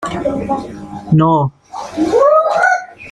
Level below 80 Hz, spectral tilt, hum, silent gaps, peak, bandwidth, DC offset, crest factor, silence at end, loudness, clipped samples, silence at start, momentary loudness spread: -44 dBFS; -7 dB/octave; none; none; -2 dBFS; 11 kHz; under 0.1%; 14 dB; 0 s; -14 LUFS; under 0.1%; 0 s; 16 LU